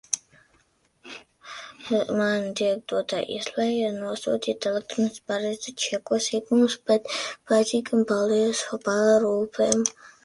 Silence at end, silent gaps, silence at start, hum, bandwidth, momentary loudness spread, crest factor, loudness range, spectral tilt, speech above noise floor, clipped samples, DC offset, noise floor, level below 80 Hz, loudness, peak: 0.15 s; none; 0.1 s; none; 11.5 kHz; 8 LU; 22 dB; 5 LU; -3.5 dB/octave; 41 dB; under 0.1%; under 0.1%; -65 dBFS; -68 dBFS; -25 LUFS; -2 dBFS